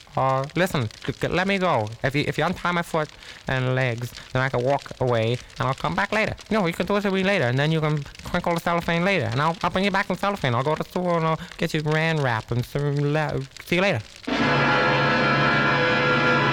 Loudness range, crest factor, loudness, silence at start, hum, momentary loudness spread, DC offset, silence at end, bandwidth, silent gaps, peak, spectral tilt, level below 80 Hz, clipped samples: 3 LU; 16 dB; -23 LUFS; 0.15 s; none; 8 LU; under 0.1%; 0 s; 17.5 kHz; none; -8 dBFS; -6 dB/octave; -48 dBFS; under 0.1%